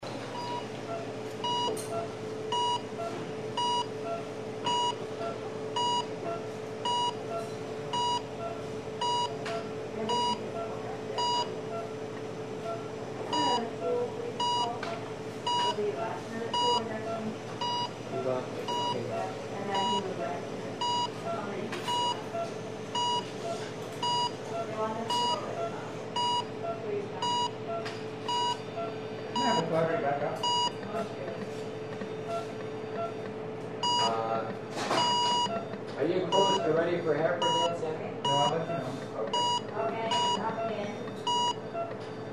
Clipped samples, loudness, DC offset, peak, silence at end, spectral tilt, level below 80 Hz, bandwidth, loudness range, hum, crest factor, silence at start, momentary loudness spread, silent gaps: under 0.1%; -32 LUFS; 0.1%; -12 dBFS; 0 s; -4 dB/octave; -66 dBFS; 13.5 kHz; 5 LU; none; 20 dB; 0 s; 10 LU; none